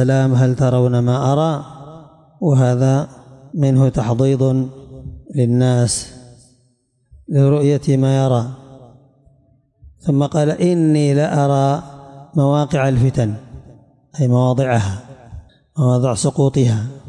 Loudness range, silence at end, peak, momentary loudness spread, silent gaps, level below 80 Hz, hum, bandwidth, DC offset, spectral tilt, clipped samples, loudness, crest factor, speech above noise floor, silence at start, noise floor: 3 LU; 0 s; -6 dBFS; 15 LU; none; -46 dBFS; none; 11 kHz; under 0.1%; -7 dB/octave; under 0.1%; -16 LUFS; 12 dB; 46 dB; 0 s; -61 dBFS